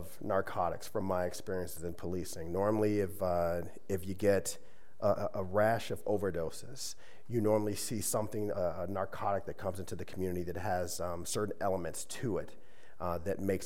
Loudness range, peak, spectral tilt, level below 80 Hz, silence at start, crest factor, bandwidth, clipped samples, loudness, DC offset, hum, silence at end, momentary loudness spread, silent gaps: 3 LU; -16 dBFS; -5 dB/octave; -64 dBFS; 0 s; 18 dB; 16 kHz; under 0.1%; -35 LUFS; 0.9%; none; 0 s; 10 LU; none